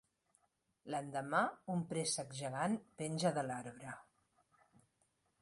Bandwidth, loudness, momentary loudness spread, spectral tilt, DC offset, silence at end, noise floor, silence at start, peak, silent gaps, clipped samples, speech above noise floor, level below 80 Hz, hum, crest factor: 11.5 kHz; -40 LUFS; 14 LU; -4.5 dB/octave; under 0.1%; 1.4 s; -80 dBFS; 0.85 s; -20 dBFS; none; under 0.1%; 41 dB; -80 dBFS; none; 22 dB